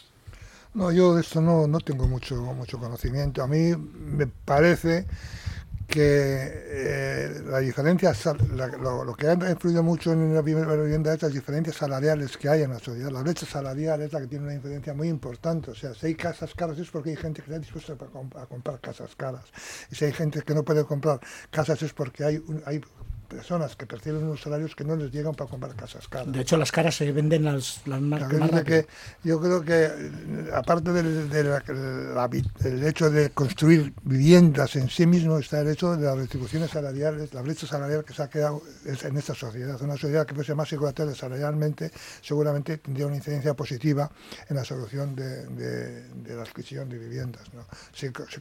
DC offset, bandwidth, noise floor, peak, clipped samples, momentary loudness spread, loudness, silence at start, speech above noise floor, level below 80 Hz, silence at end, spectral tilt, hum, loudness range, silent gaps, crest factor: under 0.1%; 16 kHz; -47 dBFS; -2 dBFS; under 0.1%; 15 LU; -26 LUFS; 0.25 s; 21 dB; -46 dBFS; 0 s; -7 dB/octave; none; 10 LU; none; 22 dB